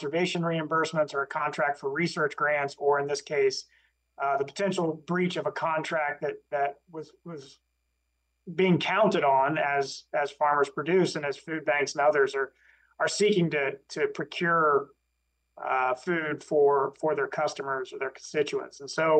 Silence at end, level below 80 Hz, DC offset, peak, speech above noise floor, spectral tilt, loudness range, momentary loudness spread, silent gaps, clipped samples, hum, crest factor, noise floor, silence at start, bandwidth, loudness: 0 s; -76 dBFS; under 0.1%; -12 dBFS; 50 dB; -5 dB/octave; 4 LU; 9 LU; none; under 0.1%; none; 16 dB; -77 dBFS; 0 s; 9.8 kHz; -27 LUFS